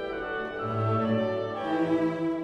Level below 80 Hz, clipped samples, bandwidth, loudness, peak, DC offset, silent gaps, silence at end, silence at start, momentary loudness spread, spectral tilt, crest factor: -58 dBFS; under 0.1%; 8 kHz; -28 LUFS; -16 dBFS; under 0.1%; none; 0 s; 0 s; 6 LU; -8.5 dB/octave; 12 dB